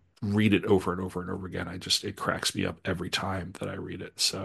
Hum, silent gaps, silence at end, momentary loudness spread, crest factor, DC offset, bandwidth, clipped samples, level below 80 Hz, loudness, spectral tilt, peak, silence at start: none; none; 0 s; 12 LU; 22 dB; under 0.1%; 12.5 kHz; under 0.1%; -58 dBFS; -29 LUFS; -4 dB/octave; -8 dBFS; 0.2 s